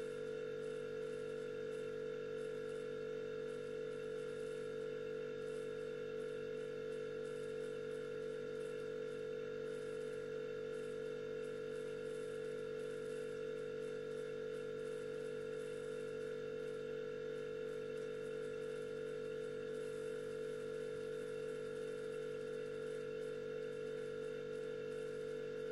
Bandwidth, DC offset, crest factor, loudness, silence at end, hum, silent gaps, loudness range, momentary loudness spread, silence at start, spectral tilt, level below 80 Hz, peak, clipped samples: 12 kHz; under 0.1%; 8 dB; -45 LUFS; 0 s; none; none; 0 LU; 0 LU; 0 s; -5.5 dB/octave; -76 dBFS; -36 dBFS; under 0.1%